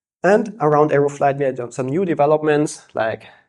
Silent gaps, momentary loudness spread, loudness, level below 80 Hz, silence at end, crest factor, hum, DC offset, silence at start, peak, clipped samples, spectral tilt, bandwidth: none; 8 LU; -18 LUFS; -62 dBFS; 0.2 s; 16 dB; none; under 0.1%; 0.25 s; -2 dBFS; under 0.1%; -6.5 dB/octave; 11.5 kHz